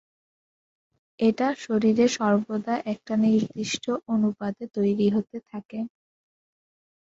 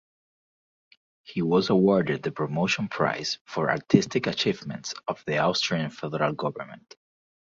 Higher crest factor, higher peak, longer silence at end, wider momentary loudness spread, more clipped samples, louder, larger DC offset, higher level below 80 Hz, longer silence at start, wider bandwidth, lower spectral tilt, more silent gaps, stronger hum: second, 16 dB vs 22 dB; second, -10 dBFS vs -4 dBFS; first, 1.3 s vs 0.7 s; about the same, 13 LU vs 11 LU; neither; about the same, -25 LUFS vs -26 LUFS; neither; about the same, -66 dBFS vs -62 dBFS; about the same, 1.2 s vs 1.3 s; about the same, 7.8 kHz vs 7.6 kHz; about the same, -5.5 dB/octave vs -5.5 dB/octave; about the same, 5.65-5.69 s vs 3.41-3.45 s; neither